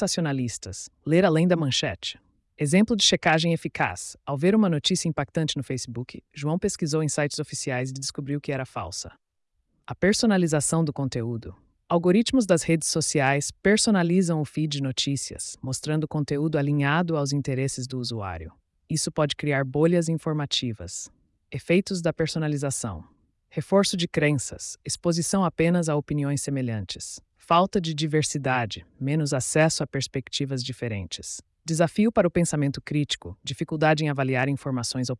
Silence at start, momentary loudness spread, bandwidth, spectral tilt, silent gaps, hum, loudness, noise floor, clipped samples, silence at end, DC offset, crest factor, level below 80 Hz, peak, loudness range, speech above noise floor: 0 s; 13 LU; 12 kHz; -4.5 dB/octave; none; none; -25 LUFS; -75 dBFS; under 0.1%; 0.05 s; under 0.1%; 16 dB; -56 dBFS; -8 dBFS; 5 LU; 50 dB